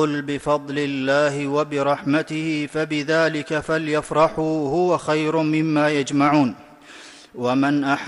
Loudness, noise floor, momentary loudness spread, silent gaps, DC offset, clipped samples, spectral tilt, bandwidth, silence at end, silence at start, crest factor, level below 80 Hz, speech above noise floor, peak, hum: -21 LUFS; -43 dBFS; 6 LU; none; under 0.1%; under 0.1%; -6 dB/octave; 11.5 kHz; 0 s; 0 s; 14 dB; -56 dBFS; 23 dB; -6 dBFS; none